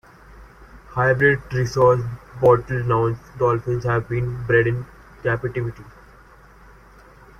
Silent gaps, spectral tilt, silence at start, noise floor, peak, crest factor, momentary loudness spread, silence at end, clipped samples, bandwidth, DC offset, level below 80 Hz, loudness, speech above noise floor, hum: none; -7.5 dB/octave; 0.3 s; -48 dBFS; -2 dBFS; 18 dB; 12 LU; 1.5 s; under 0.1%; 7 kHz; under 0.1%; -46 dBFS; -21 LUFS; 28 dB; none